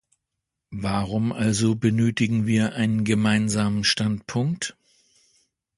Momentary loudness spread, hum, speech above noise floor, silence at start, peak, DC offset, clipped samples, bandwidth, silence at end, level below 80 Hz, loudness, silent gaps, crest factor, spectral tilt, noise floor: 6 LU; none; 61 dB; 0.7 s; -6 dBFS; under 0.1%; under 0.1%; 11.5 kHz; 1.05 s; -52 dBFS; -23 LUFS; none; 18 dB; -5 dB/octave; -83 dBFS